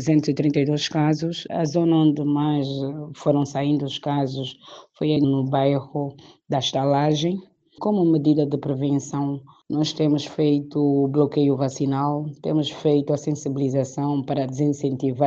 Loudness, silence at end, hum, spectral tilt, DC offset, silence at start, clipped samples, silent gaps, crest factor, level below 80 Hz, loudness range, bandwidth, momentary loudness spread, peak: -22 LUFS; 0 s; none; -7 dB/octave; under 0.1%; 0 s; under 0.1%; none; 16 dB; -64 dBFS; 2 LU; 7.6 kHz; 8 LU; -6 dBFS